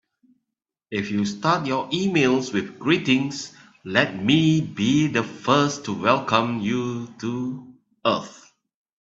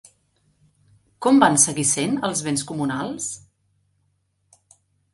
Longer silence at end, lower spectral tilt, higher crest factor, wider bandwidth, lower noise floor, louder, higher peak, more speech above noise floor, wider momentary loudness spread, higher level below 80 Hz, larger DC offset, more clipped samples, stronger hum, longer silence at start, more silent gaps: second, 0.65 s vs 1.75 s; first, -5 dB/octave vs -3.5 dB/octave; about the same, 22 dB vs 24 dB; second, 8 kHz vs 11.5 kHz; first, -84 dBFS vs -69 dBFS; about the same, -22 LUFS vs -20 LUFS; about the same, -2 dBFS vs 0 dBFS; first, 62 dB vs 48 dB; second, 11 LU vs 14 LU; about the same, -62 dBFS vs -62 dBFS; neither; neither; neither; second, 0.9 s vs 1.2 s; neither